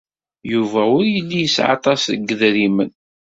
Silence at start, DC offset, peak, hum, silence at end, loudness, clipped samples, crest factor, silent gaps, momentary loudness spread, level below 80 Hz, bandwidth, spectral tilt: 0.45 s; under 0.1%; 0 dBFS; none; 0.4 s; -17 LUFS; under 0.1%; 18 dB; none; 6 LU; -58 dBFS; 7.8 kHz; -4.5 dB/octave